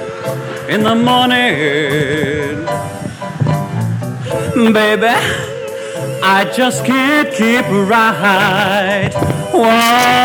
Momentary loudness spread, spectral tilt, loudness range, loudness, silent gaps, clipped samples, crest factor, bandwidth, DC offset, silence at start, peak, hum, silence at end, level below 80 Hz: 11 LU; -4.5 dB/octave; 4 LU; -13 LUFS; none; under 0.1%; 12 dB; 19.5 kHz; under 0.1%; 0 s; 0 dBFS; none; 0 s; -46 dBFS